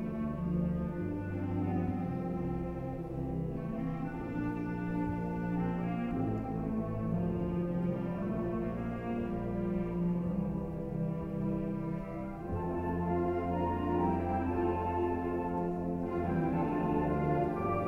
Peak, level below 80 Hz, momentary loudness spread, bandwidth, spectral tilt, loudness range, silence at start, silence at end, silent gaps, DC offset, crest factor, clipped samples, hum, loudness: -20 dBFS; -48 dBFS; 6 LU; 4.1 kHz; -10 dB/octave; 3 LU; 0 s; 0 s; none; under 0.1%; 14 dB; under 0.1%; none; -35 LUFS